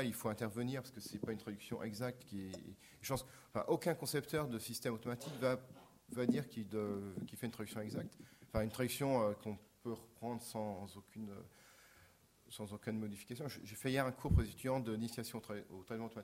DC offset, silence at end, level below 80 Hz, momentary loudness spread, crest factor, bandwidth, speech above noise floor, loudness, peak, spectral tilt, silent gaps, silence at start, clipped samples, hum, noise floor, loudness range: under 0.1%; 0 s; -54 dBFS; 13 LU; 22 dB; 16 kHz; 26 dB; -42 LUFS; -20 dBFS; -5.5 dB/octave; none; 0 s; under 0.1%; none; -68 dBFS; 7 LU